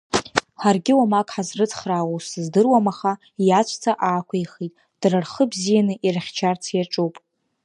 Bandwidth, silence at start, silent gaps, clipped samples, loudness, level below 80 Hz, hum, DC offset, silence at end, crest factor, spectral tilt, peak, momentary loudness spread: 11 kHz; 0.15 s; none; under 0.1%; -21 LUFS; -62 dBFS; none; under 0.1%; 0.45 s; 20 dB; -5 dB/octave; -2 dBFS; 9 LU